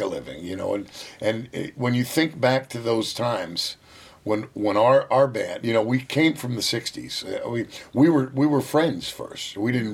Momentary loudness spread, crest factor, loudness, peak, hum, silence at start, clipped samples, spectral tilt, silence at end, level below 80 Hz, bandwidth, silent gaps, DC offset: 12 LU; 18 dB; -24 LUFS; -6 dBFS; none; 0 s; under 0.1%; -5.5 dB/octave; 0 s; -62 dBFS; 17 kHz; none; under 0.1%